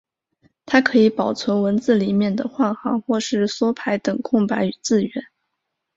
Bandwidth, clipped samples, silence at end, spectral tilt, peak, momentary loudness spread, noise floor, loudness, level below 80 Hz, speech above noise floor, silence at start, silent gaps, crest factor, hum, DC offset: 8 kHz; under 0.1%; 0.75 s; -5.5 dB/octave; -2 dBFS; 6 LU; -78 dBFS; -20 LUFS; -60 dBFS; 59 dB; 0.65 s; none; 18 dB; none; under 0.1%